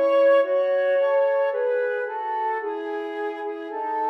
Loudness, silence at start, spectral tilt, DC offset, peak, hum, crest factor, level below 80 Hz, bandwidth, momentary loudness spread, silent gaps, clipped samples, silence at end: -23 LUFS; 0 s; -3 dB/octave; under 0.1%; -10 dBFS; none; 12 dB; under -90 dBFS; 5.6 kHz; 11 LU; none; under 0.1%; 0 s